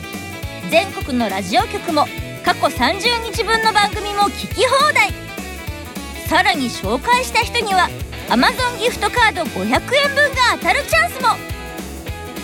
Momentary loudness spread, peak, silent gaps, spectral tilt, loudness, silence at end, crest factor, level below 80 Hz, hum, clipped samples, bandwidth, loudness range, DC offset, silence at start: 15 LU; -2 dBFS; none; -3.5 dB/octave; -16 LUFS; 0 s; 16 dB; -36 dBFS; none; under 0.1%; 18 kHz; 2 LU; under 0.1%; 0 s